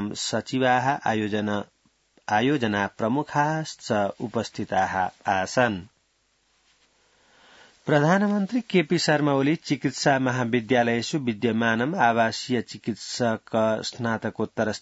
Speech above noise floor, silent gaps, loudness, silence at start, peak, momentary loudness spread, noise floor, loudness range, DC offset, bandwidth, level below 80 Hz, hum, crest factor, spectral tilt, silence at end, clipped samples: 44 dB; none; -24 LUFS; 0 s; -6 dBFS; 8 LU; -68 dBFS; 5 LU; under 0.1%; 8 kHz; -66 dBFS; none; 20 dB; -5 dB/octave; 0 s; under 0.1%